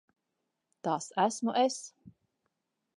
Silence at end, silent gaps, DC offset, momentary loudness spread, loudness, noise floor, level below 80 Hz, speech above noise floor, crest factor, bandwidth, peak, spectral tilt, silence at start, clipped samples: 0.85 s; none; under 0.1%; 12 LU; -31 LUFS; -84 dBFS; -84 dBFS; 53 dB; 20 dB; 11.5 kHz; -14 dBFS; -4 dB/octave; 0.85 s; under 0.1%